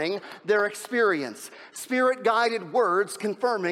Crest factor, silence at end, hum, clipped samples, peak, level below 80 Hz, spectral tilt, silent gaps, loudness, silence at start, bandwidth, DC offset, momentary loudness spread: 14 dB; 0 s; none; under 0.1%; -10 dBFS; -84 dBFS; -3.5 dB/octave; none; -25 LUFS; 0 s; 15.5 kHz; under 0.1%; 12 LU